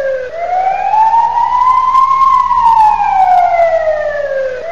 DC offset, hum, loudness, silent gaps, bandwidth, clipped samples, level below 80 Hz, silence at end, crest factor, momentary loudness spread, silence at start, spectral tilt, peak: 2%; 60 Hz at -40 dBFS; -10 LUFS; none; 7.8 kHz; under 0.1%; -42 dBFS; 0 s; 10 dB; 8 LU; 0 s; -3.5 dB/octave; 0 dBFS